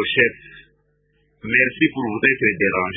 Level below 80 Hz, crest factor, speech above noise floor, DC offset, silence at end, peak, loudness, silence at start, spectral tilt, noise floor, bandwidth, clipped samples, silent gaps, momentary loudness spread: -54 dBFS; 20 dB; 44 dB; under 0.1%; 0 s; 0 dBFS; -18 LUFS; 0 s; -10 dB/octave; -63 dBFS; 3.8 kHz; under 0.1%; none; 4 LU